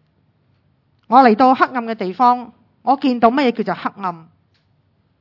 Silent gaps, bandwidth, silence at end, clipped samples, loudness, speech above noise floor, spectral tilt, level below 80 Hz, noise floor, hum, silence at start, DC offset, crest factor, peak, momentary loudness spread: none; 6 kHz; 1 s; under 0.1%; -16 LUFS; 45 dB; -7.5 dB/octave; -66 dBFS; -61 dBFS; none; 1.1 s; under 0.1%; 18 dB; 0 dBFS; 14 LU